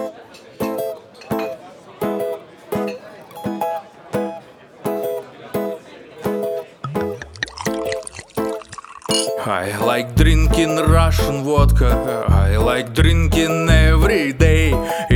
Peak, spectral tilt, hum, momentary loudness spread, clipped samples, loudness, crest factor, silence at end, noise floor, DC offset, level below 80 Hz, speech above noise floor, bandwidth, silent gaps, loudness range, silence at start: 0 dBFS; -5.5 dB/octave; none; 14 LU; under 0.1%; -19 LUFS; 18 dB; 0 s; -41 dBFS; under 0.1%; -22 dBFS; 26 dB; 19 kHz; none; 11 LU; 0 s